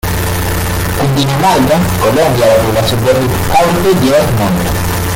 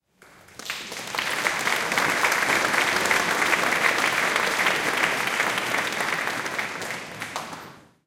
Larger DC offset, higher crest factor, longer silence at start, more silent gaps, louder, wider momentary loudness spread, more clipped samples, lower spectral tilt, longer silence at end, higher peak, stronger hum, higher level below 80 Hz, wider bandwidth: neither; second, 10 dB vs 20 dB; second, 0.05 s vs 0.55 s; neither; first, -11 LUFS vs -23 LUFS; second, 5 LU vs 12 LU; neither; first, -5 dB/octave vs -1.5 dB/octave; second, 0 s vs 0.25 s; first, 0 dBFS vs -6 dBFS; neither; first, -26 dBFS vs -62 dBFS; about the same, 17 kHz vs 17 kHz